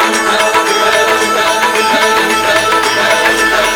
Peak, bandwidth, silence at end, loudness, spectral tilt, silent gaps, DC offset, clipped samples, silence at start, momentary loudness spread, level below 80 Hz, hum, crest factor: 0 dBFS; over 20 kHz; 0 s; -10 LUFS; -1 dB/octave; none; under 0.1%; under 0.1%; 0 s; 1 LU; -42 dBFS; none; 10 dB